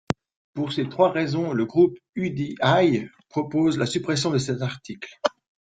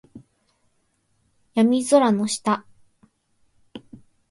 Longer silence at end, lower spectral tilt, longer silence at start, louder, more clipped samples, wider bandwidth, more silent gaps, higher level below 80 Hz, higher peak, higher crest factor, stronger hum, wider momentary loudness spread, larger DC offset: about the same, 0.4 s vs 0.5 s; about the same, -6 dB/octave vs -5 dB/octave; about the same, 0.1 s vs 0.15 s; second, -24 LUFS vs -20 LUFS; neither; second, 9.4 kHz vs 11.5 kHz; first, 0.36-0.54 s, 2.09-2.13 s vs none; first, -60 dBFS vs -66 dBFS; about the same, -2 dBFS vs -4 dBFS; about the same, 22 dB vs 20 dB; neither; second, 11 LU vs 26 LU; neither